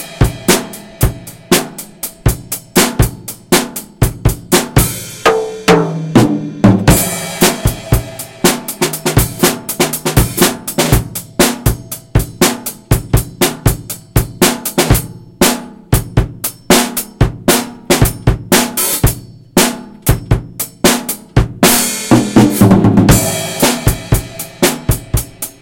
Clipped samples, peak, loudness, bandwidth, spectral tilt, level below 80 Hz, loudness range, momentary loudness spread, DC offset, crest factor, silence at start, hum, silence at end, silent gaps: 0.5%; 0 dBFS; -13 LUFS; over 20 kHz; -4.5 dB/octave; -24 dBFS; 4 LU; 8 LU; under 0.1%; 14 dB; 0 s; none; 0.1 s; none